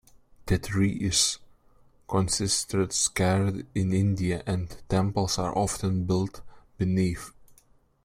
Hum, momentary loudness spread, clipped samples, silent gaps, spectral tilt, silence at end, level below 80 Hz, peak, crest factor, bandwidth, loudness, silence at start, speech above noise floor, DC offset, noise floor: none; 8 LU; under 0.1%; none; -4.5 dB/octave; 0.75 s; -46 dBFS; -10 dBFS; 18 dB; 16 kHz; -27 LUFS; 0.45 s; 35 dB; under 0.1%; -61 dBFS